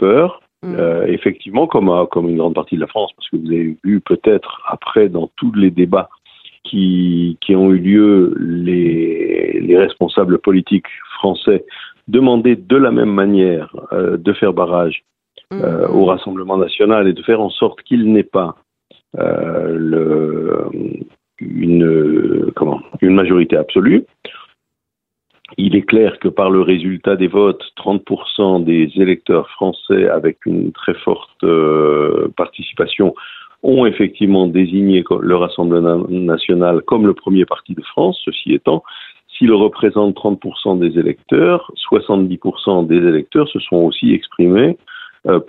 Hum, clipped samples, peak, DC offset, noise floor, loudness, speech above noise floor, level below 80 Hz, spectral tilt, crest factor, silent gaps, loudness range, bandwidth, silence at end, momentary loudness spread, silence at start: none; under 0.1%; 0 dBFS; under 0.1%; -79 dBFS; -14 LUFS; 66 dB; -52 dBFS; -10 dB/octave; 14 dB; none; 3 LU; 4.2 kHz; 0.05 s; 9 LU; 0 s